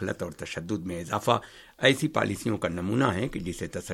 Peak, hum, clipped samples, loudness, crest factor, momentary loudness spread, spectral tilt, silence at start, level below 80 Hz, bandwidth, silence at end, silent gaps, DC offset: -6 dBFS; none; under 0.1%; -28 LUFS; 22 dB; 11 LU; -5 dB/octave; 0 s; -54 dBFS; 16.5 kHz; 0 s; none; under 0.1%